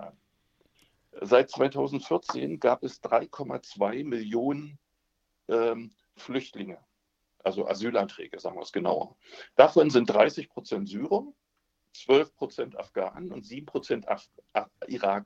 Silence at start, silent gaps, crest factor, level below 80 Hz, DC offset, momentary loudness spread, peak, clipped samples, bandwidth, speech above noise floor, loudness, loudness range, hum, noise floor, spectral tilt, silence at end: 0 s; none; 26 dB; -72 dBFS; under 0.1%; 18 LU; -2 dBFS; under 0.1%; 7.8 kHz; 50 dB; -28 LUFS; 8 LU; none; -77 dBFS; -6 dB/octave; 0 s